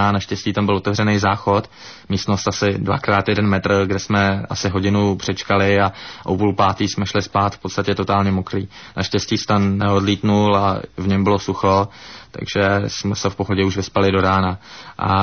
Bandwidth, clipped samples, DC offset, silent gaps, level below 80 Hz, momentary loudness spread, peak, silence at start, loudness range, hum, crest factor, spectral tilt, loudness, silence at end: 6.6 kHz; under 0.1%; 0.2%; none; -38 dBFS; 8 LU; -4 dBFS; 0 s; 2 LU; none; 14 dB; -5.5 dB/octave; -18 LUFS; 0 s